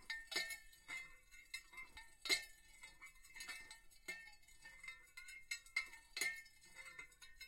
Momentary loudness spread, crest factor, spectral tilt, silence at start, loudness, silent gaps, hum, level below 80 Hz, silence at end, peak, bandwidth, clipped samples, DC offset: 19 LU; 28 dB; 1 dB/octave; 0 s; -47 LUFS; none; none; -72 dBFS; 0 s; -22 dBFS; 16 kHz; under 0.1%; under 0.1%